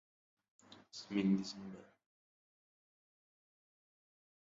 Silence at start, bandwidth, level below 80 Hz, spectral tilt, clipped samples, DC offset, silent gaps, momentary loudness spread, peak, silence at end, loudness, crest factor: 0.7 s; 7.6 kHz; -82 dBFS; -6.5 dB/octave; under 0.1%; under 0.1%; none; 18 LU; -22 dBFS; 2.65 s; -38 LUFS; 22 dB